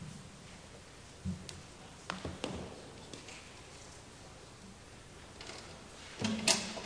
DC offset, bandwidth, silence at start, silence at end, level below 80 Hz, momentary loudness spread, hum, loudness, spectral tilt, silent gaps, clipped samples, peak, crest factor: under 0.1%; 11 kHz; 0 s; 0 s; -60 dBFS; 19 LU; none; -40 LUFS; -2.5 dB/octave; none; under 0.1%; -10 dBFS; 32 dB